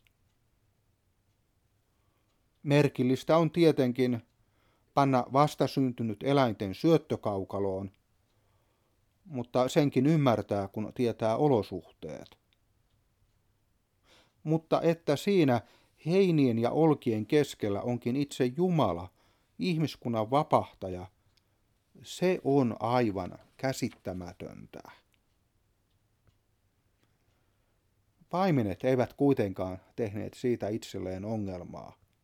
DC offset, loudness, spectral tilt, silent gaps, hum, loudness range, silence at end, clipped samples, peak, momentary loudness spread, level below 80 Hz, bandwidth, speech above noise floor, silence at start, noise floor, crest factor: under 0.1%; -29 LUFS; -7 dB/octave; none; none; 8 LU; 0.4 s; under 0.1%; -10 dBFS; 15 LU; -68 dBFS; 16.5 kHz; 44 dB; 2.65 s; -73 dBFS; 22 dB